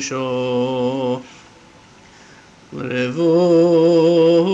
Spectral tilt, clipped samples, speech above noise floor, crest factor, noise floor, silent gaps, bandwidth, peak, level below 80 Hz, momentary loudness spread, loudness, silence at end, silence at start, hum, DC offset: -6 dB/octave; under 0.1%; 30 dB; 12 dB; -46 dBFS; none; 8 kHz; -4 dBFS; -60 dBFS; 12 LU; -16 LUFS; 0 s; 0 s; none; under 0.1%